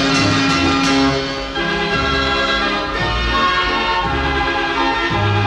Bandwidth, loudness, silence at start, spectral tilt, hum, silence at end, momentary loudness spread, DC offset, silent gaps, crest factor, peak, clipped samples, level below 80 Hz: 11.5 kHz; -16 LUFS; 0 s; -4.5 dB/octave; none; 0 s; 4 LU; under 0.1%; none; 14 dB; -4 dBFS; under 0.1%; -30 dBFS